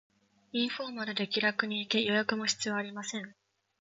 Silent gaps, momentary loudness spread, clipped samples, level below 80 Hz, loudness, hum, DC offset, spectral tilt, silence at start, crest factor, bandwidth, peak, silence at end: none; 10 LU; under 0.1%; -80 dBFS; -32 LUFS; none; under 0.1%; -3 dB/octave; 0.55 s; 24 dB; 7.8 kHz; -10 dBFS; 0.5 s